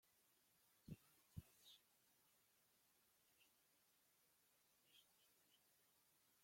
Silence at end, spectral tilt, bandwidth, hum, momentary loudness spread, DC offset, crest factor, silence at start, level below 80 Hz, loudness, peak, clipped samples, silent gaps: 0 s; -4.5 dB/octave; 16.5 kHz; none; 5 LU; under 0.1%; 28 dB; 0 s; -84 dBFS; -65 LUFS; -42 dBFS; under 0.1%; none